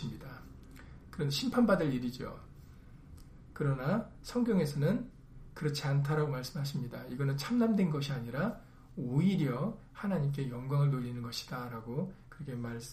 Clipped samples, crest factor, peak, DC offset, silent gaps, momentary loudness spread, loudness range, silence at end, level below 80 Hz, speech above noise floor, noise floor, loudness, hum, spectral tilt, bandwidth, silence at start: under 0.1%; 18 dB; -16 dBFS; under 0.1%; none; 19 LU; 2 LU; 0 s; -56 dBFS; 20 dB; -53 dBFS; -34 LUFS; none; -7 dB/octave; 15 kHz; 0 s